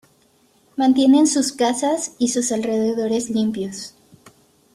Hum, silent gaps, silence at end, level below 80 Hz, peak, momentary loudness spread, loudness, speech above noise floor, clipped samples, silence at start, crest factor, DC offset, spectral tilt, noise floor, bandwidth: none; none; 0.85 s; -64 dBFS; -6 dBFS; 15 LU; -19 LUFS; 40 dB; under 0.1%; 0.75 s; 14 dB; under 0.1%; -3.5 dB/octave; -58 dBFS; 14 kHz